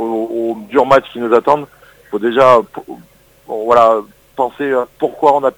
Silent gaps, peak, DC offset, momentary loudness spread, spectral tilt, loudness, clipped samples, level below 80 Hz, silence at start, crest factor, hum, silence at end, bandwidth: none; 0 dBFS; under 0.1%; 17 LU; -6 dB/octave; -14 LUFS; 0.4%; -52 dBFS; 0 s; 14 dB; none; 0.05 s; 20 kHz